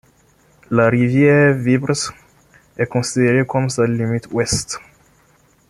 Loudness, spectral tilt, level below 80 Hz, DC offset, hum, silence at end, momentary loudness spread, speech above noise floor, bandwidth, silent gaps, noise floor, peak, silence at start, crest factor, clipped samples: -17 LUFS; -5.5 dB/octave; -48 dBFS; under 0.1%; none; 0.9 s; 9 LU; 39 dB; 12.5 kHz; none; -55 dBFS; -2 dBFS; 0.7 s; 16 dB; under 0.1%